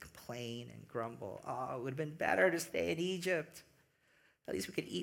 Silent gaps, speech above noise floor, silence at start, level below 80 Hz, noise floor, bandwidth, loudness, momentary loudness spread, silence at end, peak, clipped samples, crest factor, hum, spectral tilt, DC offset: none; 34 dB; 0 s; -72 dBFS; -72 dBFS; 17.5 kHz; -38 LUFS; 16 LU; 0 s; -18 dBFS; under 0.1%; 22 dB; none; -4.5 dB/octave; under 0.1%